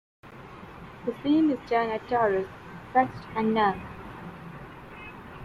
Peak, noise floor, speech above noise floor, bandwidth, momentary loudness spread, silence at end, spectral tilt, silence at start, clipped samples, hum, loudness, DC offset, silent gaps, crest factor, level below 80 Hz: -10 dBFS; -45 dBFS; 19 dB; 7.2 kHz; 20 LU; 0 s; -7.5 dB/octave; 0.25 s; under 0.1%; none; -27 LUFS; under 0.1%; none; 20 dB; -56 dBFS